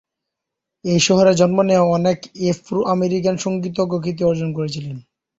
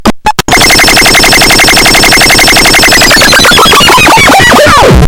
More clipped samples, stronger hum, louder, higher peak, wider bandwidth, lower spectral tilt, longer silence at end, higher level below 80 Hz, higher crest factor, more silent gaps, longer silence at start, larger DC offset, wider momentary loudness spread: second, under 0.1% vs 20%; neither; second, -18 LUFS vs -1 LUFS; about the same, -2 dBFS vs 0 dBFS; second, 8 kHz vs over 20 kHz; first, -5.5 dB/octave vs -2 dB/octave; first, 0.4 s vs 0 s; second, -54 dBFS vs -16 dBFS; first, 16 dB vs 2 dB; neither; first, 0.85 s vs 0 s; second, under 0.1% vs 2%; first, 12 LU vs 1 LU